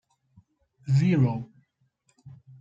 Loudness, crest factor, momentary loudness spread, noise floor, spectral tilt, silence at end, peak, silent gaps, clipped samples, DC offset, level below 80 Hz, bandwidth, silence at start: -24 LUFS; 16 dB; 21 LU; -70 dBFS; -8.5 dB/octave; 0.3 s; -12 dBFS; none; under 0.1%; under 0.1%; -64 dBFS; 7.6 kHz; 0.85 s